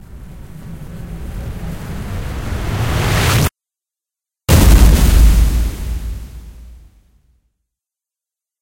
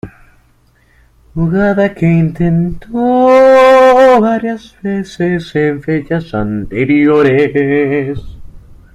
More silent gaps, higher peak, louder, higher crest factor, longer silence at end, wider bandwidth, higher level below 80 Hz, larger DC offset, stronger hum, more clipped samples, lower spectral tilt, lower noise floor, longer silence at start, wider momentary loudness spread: neither; about the same, 0 dBFS vs 0 dBFS; second, -15 LUFS vs -11 LUFS; about the same, 16 dB vs 12 dB; first, 1.85 s vs 0.35 s; first, 17 kHz vs 10.5 kHz; first, -18 dBFS vs -36 dBFS; neither; neither; neither; second, -5 dB/octave vs -8 dB/octave; first, -87 dBFS vs -50 dBFS; about the same, 0.1 s vs 0.05 s; first, 24 LU vs 14 LU